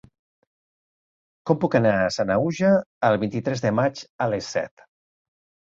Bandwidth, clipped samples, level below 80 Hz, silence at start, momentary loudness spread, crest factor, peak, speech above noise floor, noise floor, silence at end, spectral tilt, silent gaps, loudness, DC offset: 7.8 kHz; under 0.1%; -58 dBFS; 1.45 s; 9 LU; 20 dB; -4 dBFS; over 68 dB; under -90 dBFS; 1.1 s; -6.5 dB/octave; 2.86-3.01 s, 4.10-4.19 s; -23 LUFS; under 0.1%